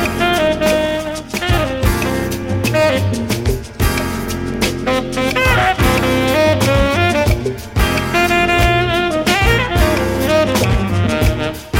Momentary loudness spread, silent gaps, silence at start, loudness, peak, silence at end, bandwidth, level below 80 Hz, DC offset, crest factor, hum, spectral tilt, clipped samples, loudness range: 7 LU; none; 0 s; -15 LUFS; 0 dBFS; 0 s; 17 kHz; -24 dBFS; under 0.1%; 14 dB; none; -5 dB/octave; under 0.1%; 3 LU